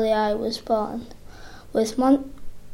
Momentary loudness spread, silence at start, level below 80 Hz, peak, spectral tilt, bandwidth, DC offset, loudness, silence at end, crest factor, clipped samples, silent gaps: 23 LU; 0 s; -44 dBFS; -8 dBFS; -5 dB/octave; 16.5 kHz; under 0.1%; -23 LUFS; 0 s; 16 dB; under 0.1%; none